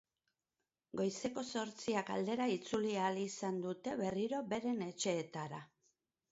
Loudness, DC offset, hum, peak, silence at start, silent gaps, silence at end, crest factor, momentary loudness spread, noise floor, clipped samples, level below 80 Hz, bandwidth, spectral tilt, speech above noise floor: -39 LUFS; under 0.1%; none; -24 dBFS; 0.95 s; none; 0.65 s; 16 dB; 5 LU; under -90 dBFS; under 0.1%; -78 dBFS; 7.6 kHz; -4.5 dB/octave; over 51 dB